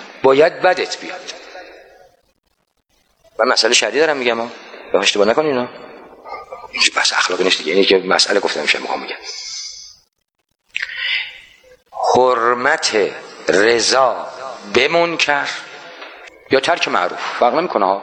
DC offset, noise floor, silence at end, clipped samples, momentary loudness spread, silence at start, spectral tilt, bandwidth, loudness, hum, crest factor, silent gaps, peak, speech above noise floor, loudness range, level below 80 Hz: under 0.1%; -70 dBFS; 0 s; under 0.1%; 19 LU; 0 s; -2 dB/octave; 10 kHz; -16 LUFS; none; 18 dB; none; 0 dBFS; 55 dB; 5 LU; -60 dBFS